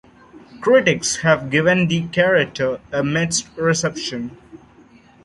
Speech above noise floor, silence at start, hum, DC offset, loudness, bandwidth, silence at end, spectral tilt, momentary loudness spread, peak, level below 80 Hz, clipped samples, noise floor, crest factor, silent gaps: 30 dB; 0.35 s; none; under 0.1%; -18 LUFS; 11.5 kHz; 0.7 s; -4 dB/octave; 10 LU; -2 dBFS; -52 dBFS; under 0.1%; -49 dBFS; 18 dB; none